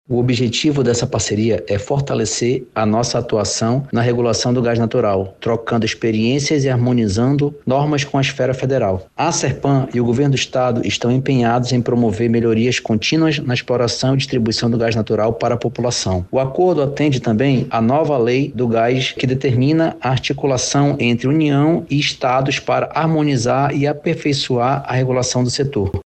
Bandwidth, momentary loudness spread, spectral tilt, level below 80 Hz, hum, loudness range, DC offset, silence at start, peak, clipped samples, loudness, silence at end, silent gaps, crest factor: 9 kHz; 3 LU; -5.5 dB/octave; -46 dBFS; none; 1 LU; under 0.1%; 0.1 s; -4 dBFS; under 0.1%; -17 LUFS; 0.05 s; none; 12 dB